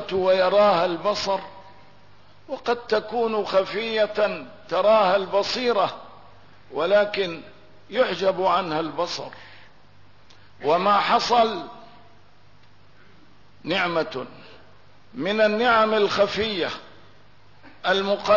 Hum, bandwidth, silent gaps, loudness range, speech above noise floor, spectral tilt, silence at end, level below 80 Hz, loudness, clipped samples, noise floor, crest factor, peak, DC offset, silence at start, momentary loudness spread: 50 Hz at -60 dBFS; 6 kHz; none; 4 LU; 33 dB; -4.5 dB/octave; 0 s; -60 dBFS; -22 LUFS; under 0.1%; -55 dBFS; 16 dB; -8 dBFS; 0.4%; 0 s; 16 LU